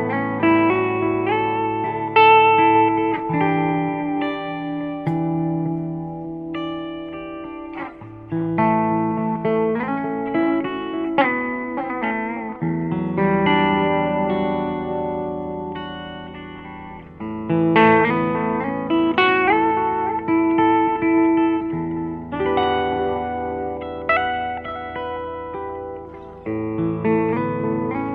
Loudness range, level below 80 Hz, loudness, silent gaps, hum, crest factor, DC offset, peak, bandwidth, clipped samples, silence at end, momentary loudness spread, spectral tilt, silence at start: 9 LU; -50 dBFS; -20 LUFS; none; none; 18 dB; under 0.1%; -2 dBFS; 4.9 kHz; under 0.1%; 0 s; 15 LU; -9.5 dB/octave; 0 s